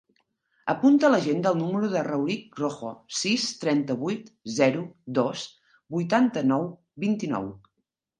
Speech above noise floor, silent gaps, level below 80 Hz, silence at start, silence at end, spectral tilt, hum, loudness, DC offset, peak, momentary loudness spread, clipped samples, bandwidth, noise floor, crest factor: 55 dB; none; -70 dBFS; 0.65 s; 0.6 s; -5 dB/octave; none; -26 LUFS; under 0.1%; -8 dBFS; 13 LU; under 0.1%; 9.8 kHz; -80 dBFS; 18 dB